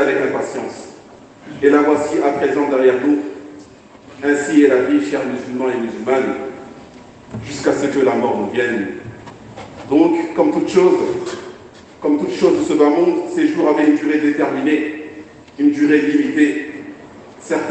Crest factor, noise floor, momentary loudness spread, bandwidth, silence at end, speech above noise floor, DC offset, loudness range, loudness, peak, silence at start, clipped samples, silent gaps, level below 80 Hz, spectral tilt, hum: 16 dB; -41 dBFS; 21 LU; 8.8 kHz; 0 s; 26 dB; under 0.1%; 4 LU; -16 LUFS; 0 dBFS; 0 s; under 0.1%; none; -58 dBFS; -5.5 dB/octave; none